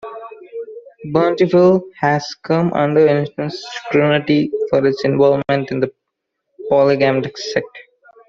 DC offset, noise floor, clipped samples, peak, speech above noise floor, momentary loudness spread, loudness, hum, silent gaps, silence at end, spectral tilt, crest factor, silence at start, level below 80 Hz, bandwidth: under 0.1%; -76 dBFS; under 0.1%; -2 dBFS; 61 dB; 18 LU; -16 LUFS; none; none; 0.5 s; -7 dB/octave; 14 dB; 0.05 s; -56 dBFS; 7.4 kHz